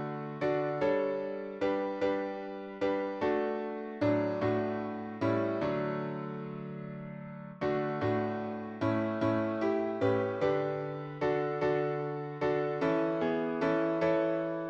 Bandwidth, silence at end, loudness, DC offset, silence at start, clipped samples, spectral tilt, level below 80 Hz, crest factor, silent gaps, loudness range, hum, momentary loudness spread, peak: 7.6 kHz; 0 s; -32 LUFS; under 0.1%; 0 s; under 0.1%; -8.5 dB/octave; -66 dBFS; 14 dB; none; 4 LU; none; 9 LU; -18 dBFS